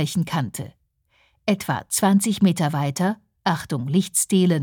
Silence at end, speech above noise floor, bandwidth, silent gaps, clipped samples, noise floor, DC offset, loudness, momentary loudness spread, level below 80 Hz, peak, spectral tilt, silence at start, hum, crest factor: 0 s; 43 dB; 19.5 kHz; none; under 0.1%; -64 dBFS; under 0.1%; -22 LUFS; 9 LU; -60 dBFS; -6 dBFS; -5 dB/octave; 0 s; none; 16 dB